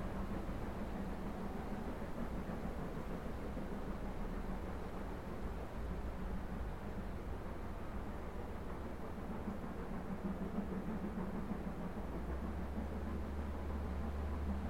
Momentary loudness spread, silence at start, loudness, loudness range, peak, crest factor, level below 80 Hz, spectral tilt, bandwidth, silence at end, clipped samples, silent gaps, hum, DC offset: 4 LU; 0 s; -45 LUFS; 3 LU; -28 dBFS; 14 dB; -46 dBFS; -8 dB/octave; 16.5 kHz; 0 s; under 0.1%; none; none; 0.3%